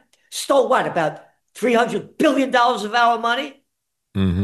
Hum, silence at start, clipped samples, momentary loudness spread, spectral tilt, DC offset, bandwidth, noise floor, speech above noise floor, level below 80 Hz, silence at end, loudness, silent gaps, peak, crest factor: none; 0.3 s; under 0.1%; 10 LU; -5 dB/octave; under 0.1%; 12.5 kHz; -77 dBFS; 58 dB; -50 dBFS; 0 s; -19 LUFS; none; -6 dBFS; 14 dB